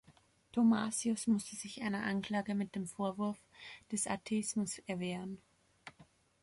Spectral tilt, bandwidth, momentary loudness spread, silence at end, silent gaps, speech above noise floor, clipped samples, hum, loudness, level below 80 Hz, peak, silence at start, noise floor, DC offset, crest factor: -4.5 dB/octave; 11.5 kHz; 20 LU; 0.4 s; none; 31 dB; under 0.1%; none; -36 LUFS; -74 dBFS; -22 dBFS; 0.1 s; -67 dBFS; under 0.1%; 16 dB